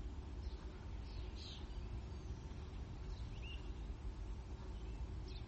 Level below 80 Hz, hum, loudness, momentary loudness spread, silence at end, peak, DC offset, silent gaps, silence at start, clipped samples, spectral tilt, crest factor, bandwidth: -48 dBFS; none; -50 LUFS; 2 LU; 0 s; -36 dBFS; under 0.1%; none; 0 s; under 0.1%; -6 dB/octave; 12 dB; 8.2 kHz